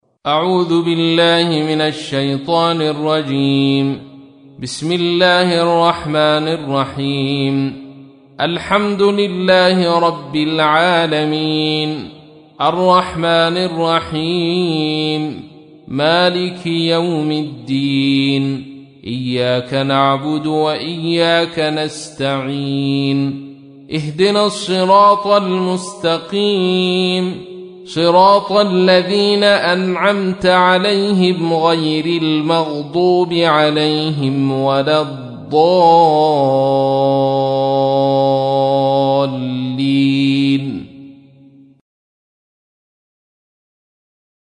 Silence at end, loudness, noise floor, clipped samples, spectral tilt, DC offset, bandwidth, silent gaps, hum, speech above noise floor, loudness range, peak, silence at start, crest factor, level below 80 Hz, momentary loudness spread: 3.3 s; -14 LUFS; -45 dBFS; under 0.1%; -6 dB/octave; under 0.1%; 10 kHz; none; none; 30 dB; 4 LU; 0 dBFS; 0.25 s; 14 dB; -54 dBFS; 9 LU